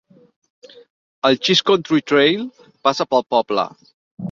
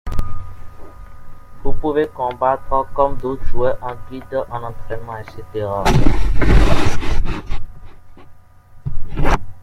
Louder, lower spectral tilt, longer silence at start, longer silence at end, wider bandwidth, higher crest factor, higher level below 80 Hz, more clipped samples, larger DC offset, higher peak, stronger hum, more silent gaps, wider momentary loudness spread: first, -17 LUFS vs -21 LUFS; second, -4.5 dB/octave vs -6.5 dB/octave; first, 1.25 s vs 0.05 s; about the same, 0 s vs 0 s; about the same, 7.4 kHz vs 8 kHz; about the same, 18 dB vs 14 dB; second, -64 dBFS vs -22 dBFS; neither; neither; about the same, -2 dBFS vs 0 dBFS; neither; first, 3.94-4.17 s vs none; second, 11 LU vs 17 LU